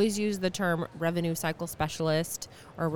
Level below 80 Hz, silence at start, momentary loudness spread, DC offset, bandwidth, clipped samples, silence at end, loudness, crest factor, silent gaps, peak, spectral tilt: -58 dBFS; 0 s; 7 LU; 0.2%; 19 kHz; under 0.1%; 0 s; -30 LUFS; 16 dB; none; -14 dBFS; -5 dB/octave